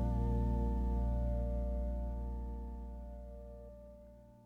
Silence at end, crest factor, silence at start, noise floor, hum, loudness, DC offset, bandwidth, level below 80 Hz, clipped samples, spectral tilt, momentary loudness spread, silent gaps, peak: 0.05 s; 12 dB; 0 s; -57 dBFS; 60 Hz at -55 dBFS; -39 LUFS; under 0.1%; 2.2 kHz; -38 dBFS; under 0.1%; -10.5 dB/octave; 19 LU; none; -24 dBFS